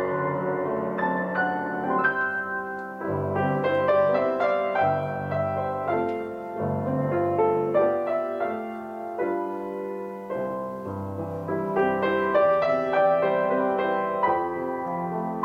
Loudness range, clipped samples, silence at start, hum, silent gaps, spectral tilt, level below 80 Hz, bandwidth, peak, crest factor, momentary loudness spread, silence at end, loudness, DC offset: 5 LU; under 0.1%; 0 s; none; none; -8.5 dB/octave; -66 dBFS; 6.6 kHz; -10 dBFS; 16 dB; 11 LU; 0 s; -26 LUFS; under 0.1%